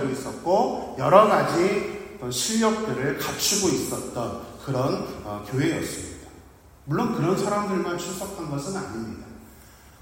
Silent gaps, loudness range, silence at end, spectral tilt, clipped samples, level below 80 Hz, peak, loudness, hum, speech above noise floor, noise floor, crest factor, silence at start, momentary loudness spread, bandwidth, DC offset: none; 6 LU; 0.1 s; -4.5 dB/octave; under 0.1%; -54 dBFS; -2 dBFS; -24 LUFS; none; 25 dB; -50 dBFS; 24 dB; 0 s; 14 LU; 16.5 kHz; under 0.1%